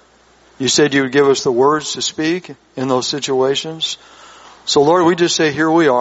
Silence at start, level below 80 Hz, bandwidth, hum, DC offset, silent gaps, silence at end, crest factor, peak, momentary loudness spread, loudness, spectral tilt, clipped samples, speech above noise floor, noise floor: 0.6 s; -58 dBFS; 8.2 kHz; none; under 0.1%; none; 0 s; 14 dB; -2 dBFS; 9 LU; -15 LUFS; -3.5 dB/octave; under 0.1%; 35 dB; -50 dBFS